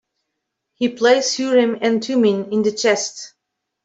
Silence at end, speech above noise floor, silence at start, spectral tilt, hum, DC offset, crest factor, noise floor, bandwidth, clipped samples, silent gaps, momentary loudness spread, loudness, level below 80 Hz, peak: 0.55 s; 61 dB; 0.8 s; -3.5 dB/octave; none; under 0.1%; 16 dB; -78 dBFS; 8.2 kHz; under 0.1%; none; 9 LU; -18 LUFS; -68 dBFS; -2 dBFS